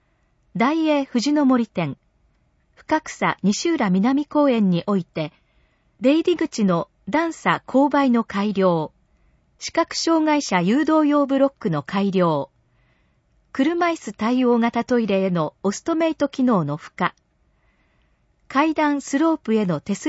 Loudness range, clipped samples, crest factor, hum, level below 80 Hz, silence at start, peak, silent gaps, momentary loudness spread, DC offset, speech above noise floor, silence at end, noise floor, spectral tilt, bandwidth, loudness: 3 LU; under 0.1%; 18 dB; none; -60 dBFS; 0.55 s; -2 dBFS; none; 8 LU; under 0.1%; 44 dB; 0 s; -63 dBFS; -6 dB/octave; 8 kHz; -21 LUFS